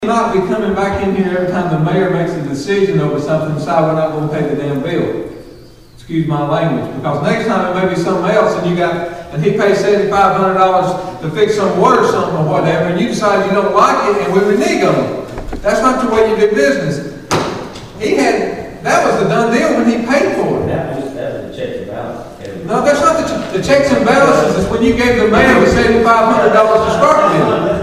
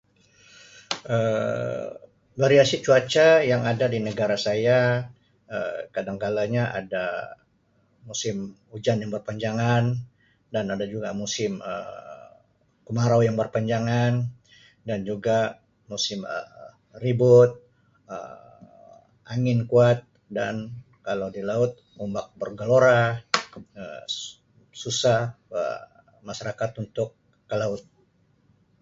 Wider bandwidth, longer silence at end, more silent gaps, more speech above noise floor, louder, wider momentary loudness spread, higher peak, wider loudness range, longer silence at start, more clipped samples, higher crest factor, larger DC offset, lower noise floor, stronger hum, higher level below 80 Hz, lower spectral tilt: first, 14.5 kHz vs 7.8 kHz; second, 0 s vs 1 s; neither; second, 26 dB vs 42 dB; first, -13 LUFS vs -24 LUFS; second, 12 LU vs 19 LU; about the same, 0 dBFS vs 0 dBFS; about the same, 7 LU vs 8 LU; second, 0 s vs 0.75 s; neither; second, 12 dB vs 24 dB; first, 0.4% vs under 0.1%; second, -38 dBFS vs -65 dBFS; neither; first, -36 dBFS vs -60 dBFS; about the same, -6 dB/octave vs -5.5 dB/octave